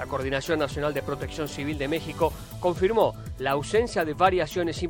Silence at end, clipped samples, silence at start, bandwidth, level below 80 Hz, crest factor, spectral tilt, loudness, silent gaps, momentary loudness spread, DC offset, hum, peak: 0 s; under 0.1%; 0 s; 17 kHz; -44 dBFS; 20 dB; -5.5 dB/octave; -26 LUFS; none; 8 LU; under 0.1%; none; -6 dBFS